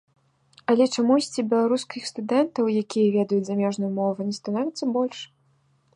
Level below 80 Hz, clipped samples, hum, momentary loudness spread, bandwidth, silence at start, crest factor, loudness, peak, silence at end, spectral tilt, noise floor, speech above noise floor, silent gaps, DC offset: -72 dBFS; under 0.1%; none; 9 LU; 11 kHz; 0.7 s; 16 dB; -24 LUFS; -8 dBFS; 0.7 s; -5.5 dB/octave; -64 dBFS; 41 dB; none; under 0.1%